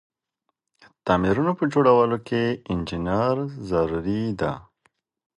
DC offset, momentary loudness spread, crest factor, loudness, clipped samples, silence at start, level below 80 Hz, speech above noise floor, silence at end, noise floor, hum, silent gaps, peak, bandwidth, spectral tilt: under 0.1%; 10 LU; 20 dB; -23 LUFS; under 0.1%; 1.05 s; -46 dBFS; 56 dB; 0.75 s; -78 dBFS; none; none; -4 dBFS; 10.5 kHz; -8 dB/octave